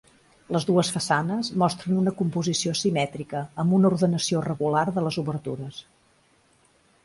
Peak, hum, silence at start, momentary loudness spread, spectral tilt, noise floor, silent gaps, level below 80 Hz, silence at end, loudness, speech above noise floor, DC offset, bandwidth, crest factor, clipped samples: -8 dBFS; none; 0.5 s; 11 LU; -5.5 dB/octave; -62 dBFS; none; -62 dBFS; 1.25 s; -25 LUFS; 38 dB; under 0.1%; 11.5 kHz; 18 dB; under 0.1%